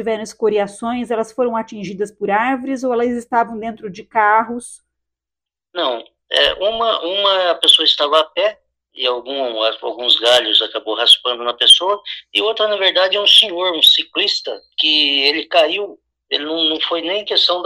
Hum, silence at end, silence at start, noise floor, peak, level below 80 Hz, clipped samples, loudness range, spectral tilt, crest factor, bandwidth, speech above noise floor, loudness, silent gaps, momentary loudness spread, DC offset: none; 0 s; 0 s; -87 dBFS; 0 dBFS; -58 dBFS; under 0.1%; 8 LU; -1.5 dB/octave; 16 dB; 15.5 kHz; 71 dB; -14 LUFS; none; 13 LU; under 0.1%